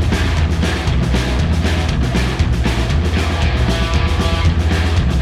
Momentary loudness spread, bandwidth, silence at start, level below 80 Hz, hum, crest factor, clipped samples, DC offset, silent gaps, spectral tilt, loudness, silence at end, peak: 1 LU; 13 kHz; 0 s; -18 dBFS; none; 12 dB; under 0.1%; under 0.1%; none; -6 dB/octave; -17 LUFS; 0 s; -4 dBFS